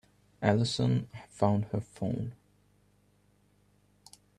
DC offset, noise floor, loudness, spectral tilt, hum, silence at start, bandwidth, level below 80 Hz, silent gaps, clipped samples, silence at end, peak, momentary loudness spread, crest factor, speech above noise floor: under 0.1%; -67 dBFS; -31 LUFS; -6.5 dB/octave; 50 Hz at -55 dBFS; 0.4 s; 11.5 kHz; -62 dBFS; none; under 0.1%; 2.05 s; -10 dBFS; 9 LU; 24 dB; 37 dB